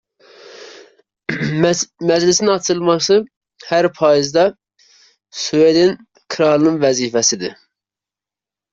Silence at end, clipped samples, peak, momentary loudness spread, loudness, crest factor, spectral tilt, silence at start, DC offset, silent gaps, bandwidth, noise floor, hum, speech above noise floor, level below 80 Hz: 1.2 s; under 0.1%; -2 dBFS; 15 LU; -15 LUFS; 16 dB; -4 dB/octave; 0.5 s; under 0.1%; 3.37-3.41 s; 7.8 kHz; -89 dBFS; none; 74 dB; -58 dBFS